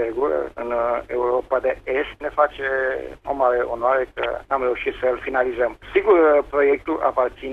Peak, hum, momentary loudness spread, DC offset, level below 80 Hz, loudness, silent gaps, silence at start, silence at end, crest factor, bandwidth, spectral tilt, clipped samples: -4 dBFS; none; 8 LU; under 0.1%; -48 dBFS; -21 LUFS; none; 0 s; 0 s; 16 dB; 6.2 kHz; -6.5 dB/octave; under 0.1%